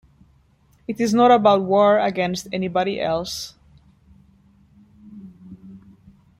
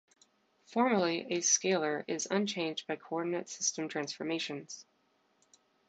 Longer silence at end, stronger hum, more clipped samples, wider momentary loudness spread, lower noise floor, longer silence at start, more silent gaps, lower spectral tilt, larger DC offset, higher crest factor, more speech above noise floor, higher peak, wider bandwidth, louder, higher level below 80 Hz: second, 0.6 s vs 1.05 s; neither; neither; first, 21 LU vs 11 LU; second, -58 dBFS vs -73 dBFS; first, 0.9 s vs 0.7 s; neither; first, -5.5 dB/octave vs -2.5 dB/octave; neither; about the same, 18 dB vs 18 dB; about the same, 39 dB vs 40 dB; first, -4 dBFS vs -16 dBFS; first, 15.5 kHz vs 9.2 kHz; first, -19 LUFS vs -33 LUFS; first, -56 dBFS vs -82 dBFS